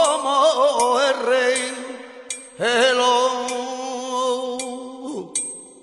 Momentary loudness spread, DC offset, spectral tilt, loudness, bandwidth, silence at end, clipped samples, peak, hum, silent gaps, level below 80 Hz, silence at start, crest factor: 15 LU; under 0.1%; -1 dB/octave; -20 LUFS; 11.5 kHz; 0.1 s; under 0.1%; -6 dBFS; none; none; -72 dBFS; 0 s; 16 dB